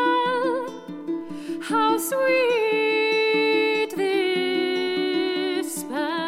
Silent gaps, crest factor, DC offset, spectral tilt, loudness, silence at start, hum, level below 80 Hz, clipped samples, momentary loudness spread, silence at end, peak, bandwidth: none; 14 dB; under 0.1%; -3 dB/octave; -23 LUFS; 0 s; none; -72 dBFS; under 0.1%; 11 LU; 0 s; -10 dBFS; 16.5 kHz